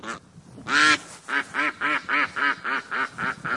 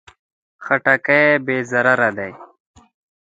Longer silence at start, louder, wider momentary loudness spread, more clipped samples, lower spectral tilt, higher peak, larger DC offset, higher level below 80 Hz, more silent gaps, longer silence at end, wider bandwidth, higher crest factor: second, 0.05 s vs 0.6 s; second, -23 LUFS vs -16 LUFS; second, 10 LU vs 16 LU; neither; second, -1.5 dB/octave vs -6 dB/octave; second, -4 dBFS vs 0 dBFS; neither; about the same, -66 dBFS vs -62 dBFS; neither; second, 0 s vs 0.8 s; first, 11.5 kHz vs 9 kHz; about the same, 22 dB vs 20 dB